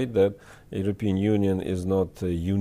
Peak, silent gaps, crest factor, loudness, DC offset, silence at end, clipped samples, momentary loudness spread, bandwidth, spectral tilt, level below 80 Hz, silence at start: -12 dBFS; none; 14 dB; -26 LUFS; under 0.1%; 0 s; under 0.1%; 7 LU; 14 kHz; -8 dB/octave; -48 dBFS; 0 s